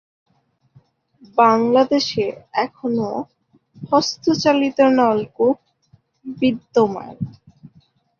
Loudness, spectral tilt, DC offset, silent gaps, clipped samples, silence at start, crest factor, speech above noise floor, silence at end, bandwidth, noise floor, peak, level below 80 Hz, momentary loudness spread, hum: -18 LUFS; -5 dB/octave; under 0.1%; none; under 0.1%; 1.35 s; 18 dB; 39 dB; 0.5 s; 7.2 kHz; -57 dBFS; -2 dBFS; -60 dBFS; 16 LU; none